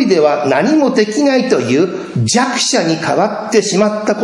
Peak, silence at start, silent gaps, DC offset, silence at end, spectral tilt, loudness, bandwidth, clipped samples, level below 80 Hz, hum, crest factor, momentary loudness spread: 0 dBFS; 0 s; none; under 0.1%; 0 s; -4.5 dB/octave; -13 LUFS; 11.5 kHz; under 0.1%; -60 dBFS; none; 12 dB; 3 LU